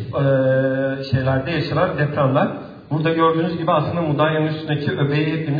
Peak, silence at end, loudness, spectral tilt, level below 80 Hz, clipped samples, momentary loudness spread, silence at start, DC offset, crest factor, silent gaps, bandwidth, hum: -2 dBFS; 0 s; -19 LUFS; -9.5 dB/octave; -50 dBFS; under 0.1%; 5 LU; 0 s; under 0.1%; 16 dB; none; 5 kHz; none